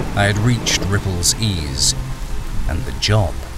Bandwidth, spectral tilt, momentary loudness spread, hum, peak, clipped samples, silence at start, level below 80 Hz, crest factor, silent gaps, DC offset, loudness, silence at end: 16 kHz; -3.5 dB/octave; 11 LU; none; -2 dBFS; under 0.1%; 0 s; -26 dBFS; 16 dB; none; under 0.1%; -18 LUFS; 0 s